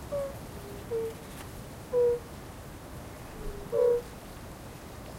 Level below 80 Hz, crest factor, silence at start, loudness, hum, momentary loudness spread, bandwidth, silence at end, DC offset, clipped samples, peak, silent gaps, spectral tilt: -48 dBFS; 18 dB; 0 s; -32 LUFS; none; 17 LU; 16 kHz; 0 s; under 0.1%; under 0.1%; -16 dBFS; none; -5.5 dB/octave